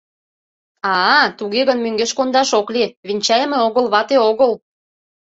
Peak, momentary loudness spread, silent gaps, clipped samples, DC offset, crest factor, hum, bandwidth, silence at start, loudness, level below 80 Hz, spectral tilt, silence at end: 0 dBFS; 7 LU; 2.97-3.03 s; under 0.1%; under 0.1%; 16 dB; none; 8 kHz; 0.85 s; -16 LUFS; -64 dBFS; -2.5 dB/octave; 0.65 s